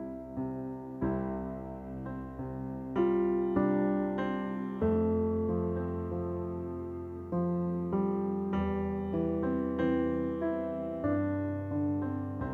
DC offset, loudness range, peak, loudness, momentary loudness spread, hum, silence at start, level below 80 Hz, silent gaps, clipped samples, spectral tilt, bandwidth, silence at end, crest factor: under 0.1%; 3 LU; -16 dBFS; -33 LUFS; 11 LU; none; 0 s; -54 dBFS; none; under 0.1%; -10.5 dB/octave; 4.2 kHz; 0 s; 16 dB